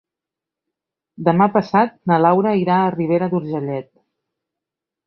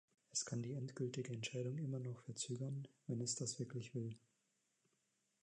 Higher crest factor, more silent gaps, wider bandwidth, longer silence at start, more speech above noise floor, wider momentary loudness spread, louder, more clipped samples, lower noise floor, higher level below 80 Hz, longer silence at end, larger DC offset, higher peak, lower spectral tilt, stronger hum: about the same, 18 dB vs 18 dB; neither; second, 6 kHz vs 10.5 kHz; first, 1.2 s vs 0.35 s; first, 69 dB vs 39 dB; first, 9 LU vs 6 LU; first, -17 LUFS vs -45 LUFS; neither; about the same, -86 dBFS vs -84 dBFS; first, -62 dBFS vs -86 dBFS; about the same, 1.25 s vs 1.25 s; neither; first, -2 dBFS vs -28 dBFS; first, -9.5 dB/octave vs -4.5 dB/octave; neither